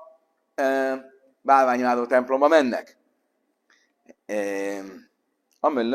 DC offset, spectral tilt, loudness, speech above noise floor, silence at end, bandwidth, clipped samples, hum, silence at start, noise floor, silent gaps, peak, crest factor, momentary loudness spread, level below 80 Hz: under 0.1%; -4.5 dB/octave; -23 LUFS; 51 dB; 0 s; 14.5 kHz; under 0.1%; none; 0 s; -73 dBFS; none; -4 dBFS; 22 dB; 15 LU; -78 dBFS